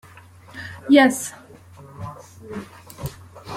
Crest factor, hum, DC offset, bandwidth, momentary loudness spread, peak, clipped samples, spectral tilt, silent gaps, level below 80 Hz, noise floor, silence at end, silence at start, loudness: 22 dB; none; under 0.1%; 16.5 kHz; 26 LU; -2 dBFS; under 0.1%; -4.5 dB/octave; none; -54 dBFS; -46 dBFS; 0 s; 0.55 s; -17 LUFS